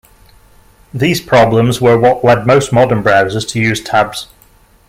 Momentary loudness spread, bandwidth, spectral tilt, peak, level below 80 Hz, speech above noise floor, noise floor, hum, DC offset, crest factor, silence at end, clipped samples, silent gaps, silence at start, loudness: 7 LU; 16 kHz; -5.5 dB/octave; 0 dBFS; -42 dBFS; 36 dB; -47 dBFS; none; under 0.1%; 12 dB; 0.65 s; under 0.1%; none; 0.95 s; -11 LUFS